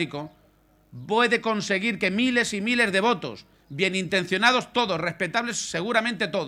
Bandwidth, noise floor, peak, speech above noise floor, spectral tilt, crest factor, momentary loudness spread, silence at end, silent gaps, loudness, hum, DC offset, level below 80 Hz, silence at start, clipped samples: 14.5 kHz; -60 dBFS; -6 dBFS; 35 dB; -3.5 dB/octave; 20 dB; 10 LU; 0 s; none; -23 LUFS; none; under 0.1%; -62 dBFS; 0 s; under 0.1%